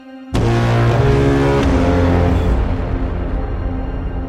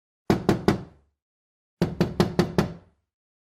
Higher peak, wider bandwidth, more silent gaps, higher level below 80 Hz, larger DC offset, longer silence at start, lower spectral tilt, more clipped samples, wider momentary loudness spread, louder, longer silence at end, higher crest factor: about the same, -2 dBFS vs -4 dBFS; second, 10.5 kHz vs 16 kHz; second, none vs 1.22-1.77 s; first, -22 dBFS vs -46 dBFS; neither; second, 0 s vs 0.3 s; about the same, -7.5 dB/octave vs -7 dB/octave; neither; about the same, 9 LU vs 7 LU; first, -16 LUFS vs -25 LUFS; second, 0 s vs 0.8 s; second, 12 dB vs 22 dB